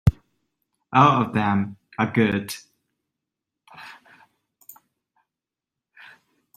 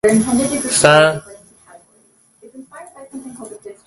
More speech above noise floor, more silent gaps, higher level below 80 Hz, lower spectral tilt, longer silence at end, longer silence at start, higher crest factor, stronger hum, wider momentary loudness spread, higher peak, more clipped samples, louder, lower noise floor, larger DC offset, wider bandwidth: first, 68 dB vs 41 dB; neither; first, -44 dBFS vs -50 dBFS; first, -6.5 dB/octave vs -3.5 dB/octave; first, 2.65 s vs 0.15 s; about the same, 0.05 s vs 0.05 s; first, 24 dB vs 18 dB; neither; about the same, 25 LU vs 26 LU; about the same, -2 dBFS vs 0 dBFS; neither; second, -21 LUFS vs -13 LUFS; first, -88 dBFS vs -54 dBFS; neither; first, 15.5 kHz vs 12 kHz